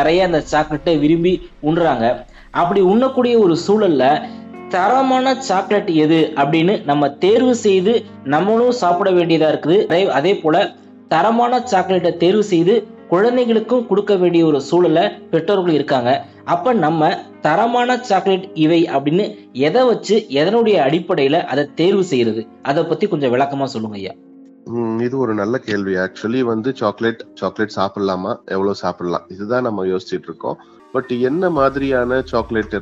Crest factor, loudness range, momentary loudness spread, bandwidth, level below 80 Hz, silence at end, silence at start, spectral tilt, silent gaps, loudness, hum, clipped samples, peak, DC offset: 14 dB; 6 LU; 8 LU; 8 kHz; -48 dBFS; 0 s; 0 s; -6 dB/octave; none; -16 LUFS; none; under 0.1%; -2 dBFS; under 0.1%